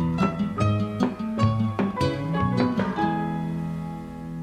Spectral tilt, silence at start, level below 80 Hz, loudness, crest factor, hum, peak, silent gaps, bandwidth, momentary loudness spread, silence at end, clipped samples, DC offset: -8 dB/octave; 0 s; -46 dBFS; -25 LUFS; 18 dB; none; -6 dBFS; none; 11 kHz; 8 LU; 0 s; under 0.1%; under 0.1%